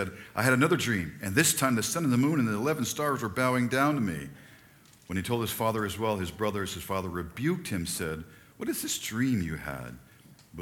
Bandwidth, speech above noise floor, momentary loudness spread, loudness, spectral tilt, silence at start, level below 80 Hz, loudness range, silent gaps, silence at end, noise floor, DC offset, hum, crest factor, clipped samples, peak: 19 kHz; 28 dB; 12 LU; -29 LUFS; -4.5 dB/octave; 0 s; -56 dBFS; 6 LU; none; 0 s; -57 dBFS; under 0.1%; none; 20 dB; under 0.1%; -8 dBFS